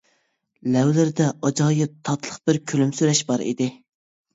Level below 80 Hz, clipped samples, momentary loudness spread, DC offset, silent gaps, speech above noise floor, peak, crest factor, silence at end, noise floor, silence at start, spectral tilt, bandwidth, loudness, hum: -64 dBFS; under 0.1%; 8 LU; under 0.1%; none; 48 dB; -6 dBFS; 16 dB; 0.6 s; -69 dBFS; 0.65 s; -5.5 dB/octave; 8 kHz; -22 LUFS; none